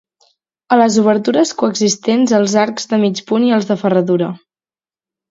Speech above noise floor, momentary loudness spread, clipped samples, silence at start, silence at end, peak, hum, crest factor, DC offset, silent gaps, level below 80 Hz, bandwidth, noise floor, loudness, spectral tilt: over 77 dB; 4 LU; under 0.1%; 0.7 s; 0.95 s; 0 dBFS; none; 14 dB; under 0.1%; none; -64 dBFS; 7.8 kHz; under -90 dBFS; -14 LUFS; -5 dB/octave